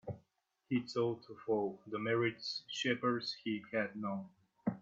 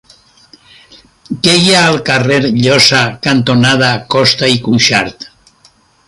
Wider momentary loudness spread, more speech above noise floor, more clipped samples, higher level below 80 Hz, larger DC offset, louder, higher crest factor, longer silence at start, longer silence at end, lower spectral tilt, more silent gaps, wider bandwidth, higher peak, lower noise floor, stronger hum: first, 10 LU vs 7 LU; about the same, 41 dB vs 38 dB; neither; second, -80 dBFS vs -46 dBFS; neither; second, -38 LUFS vs -9 LUFS; first, 18 dB vs 12 dB; second, 0.05 s vs 1.3 s; second, 0 s vs 0.85 s; first, -5.5 dB/octave vs -4 dB/octave; neither; second, 7.8 kHz vs 16 kHz; second, -20 dBFS vs 0 dBFS; first, -78 dBFS vs -48 dBFS; neither